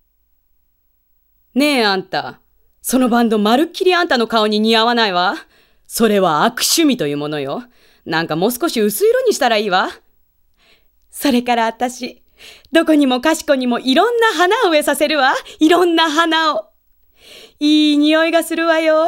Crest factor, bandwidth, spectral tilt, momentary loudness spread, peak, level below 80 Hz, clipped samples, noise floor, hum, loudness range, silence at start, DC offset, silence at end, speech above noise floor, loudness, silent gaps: 16 dB; 16 kHz; -3.5 dB/octave; 10 LU; 0 dBFS; -56 dBFS; under 0.1%; -61 dBFS; none; 4 LU; 1.55 s; under 0.1%; 0 s; 46 dB; -15 LUFS; none